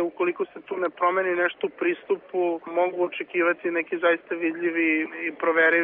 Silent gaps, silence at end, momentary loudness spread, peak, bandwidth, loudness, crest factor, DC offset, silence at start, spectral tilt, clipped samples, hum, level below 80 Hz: none; 0 s; 6 LU; -10 dBFS; 3.8 kHz; -25 LUFS; 16 dB; under 0.1%; 0 s; -2 dB/octave; under 0.1%; none; -76 dBFS